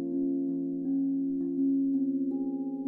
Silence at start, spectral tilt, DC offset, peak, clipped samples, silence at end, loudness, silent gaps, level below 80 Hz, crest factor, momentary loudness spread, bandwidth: 0 s; -13.5 dB/octave; under 0.1%; -20 dBFS; under 0.1%; 0 s; -30 LUFS; none; -74 dBFS; 8 dB; 4 LU; 0.9 kHz